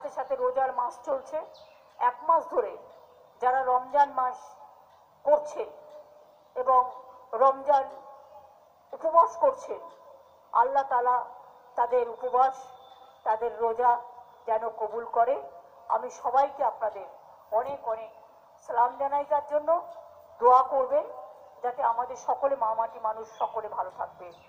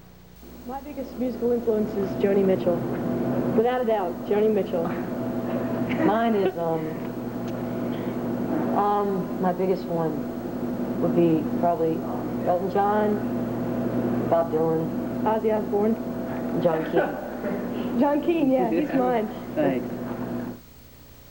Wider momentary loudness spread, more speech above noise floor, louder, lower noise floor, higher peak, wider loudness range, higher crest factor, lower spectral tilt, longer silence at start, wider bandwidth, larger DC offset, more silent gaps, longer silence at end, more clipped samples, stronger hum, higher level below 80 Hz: first, 17 LU vs 9 LU; first, 31 dB vs 24 dB; about the same, -27 LUFS vs -25 LUFS; first, -57 dBFS vs -48 dBFS; about the same, -8 dBFS vs -10 dBFS; about the same, 4 LU vs 2 LU; about the same, 20 dB vs 16 dB; second, -4 dB/octave vs -8 dB/octave; second, 0 s vs 0.25 s; about the same, 15.5 kHz vs 17 kHz; second, under 0.1% vs 0.1%; neither; first, 0.15 s vs 0 s; neither; second, none vs 60 Hz at -45 dBFS; second, -72 dBFS vs -52 dBFS